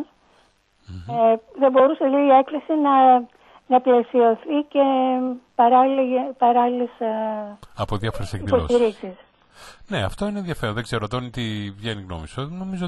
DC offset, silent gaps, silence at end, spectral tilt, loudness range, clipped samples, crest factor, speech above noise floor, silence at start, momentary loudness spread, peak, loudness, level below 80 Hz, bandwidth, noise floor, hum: under 0.1%; none; 0 s; -7 dB/octave; 9 LU; under 0.1%; 16 dB; 40 dB; 0 s; 15 LU; -4 dBFS; -20 LUFS; -46 dBFS; 12 kHz; -60 dBFS; none